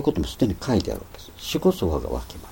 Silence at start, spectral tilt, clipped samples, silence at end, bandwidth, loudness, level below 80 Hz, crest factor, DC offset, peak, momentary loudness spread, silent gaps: 0 s; -6 dB/octave; under 0.1%; 0 s; 17 kHz; -25 LUFS; -36 dBFS; 18 dB; under 0.1%; -6 dBFS; 13 LU; none